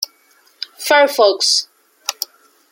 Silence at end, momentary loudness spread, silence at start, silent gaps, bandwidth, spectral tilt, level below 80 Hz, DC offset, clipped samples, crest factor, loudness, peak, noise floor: 0.6 s; 19 LU; 0 s; none; 17 kHz; 1 dB/octave; -76 dBFS; under 0.1%; under 0.1%; 18 dB; -15 LUFS; 0 dBFS; -54 dBFS